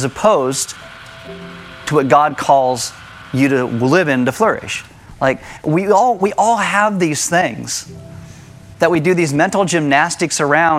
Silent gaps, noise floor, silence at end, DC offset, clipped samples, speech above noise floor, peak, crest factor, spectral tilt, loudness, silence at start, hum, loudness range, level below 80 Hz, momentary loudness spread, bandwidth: none; -37 dBFS; 0 s; under 0.1%; under 0.1%; 23 dB; 0 dBFS; 16 dB; -4.5 dB/octave; -15 LUFS; 0 s; none; 2 LU; -50 dBFS; 19 LU; 15.5 kHz